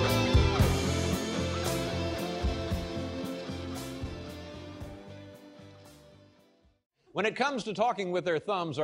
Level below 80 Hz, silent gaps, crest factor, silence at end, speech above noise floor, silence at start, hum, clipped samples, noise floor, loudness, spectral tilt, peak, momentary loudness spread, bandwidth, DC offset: -40 dBFS; 6.86-6.90 s; 18 dB; 0 s; 34 dB; 0 s; none; under 0.1%; -64 dBFS; -31 LUFS; -5.5 dB/octave; -14 dBFS; 20 LU; 16 kHz; under 0.1%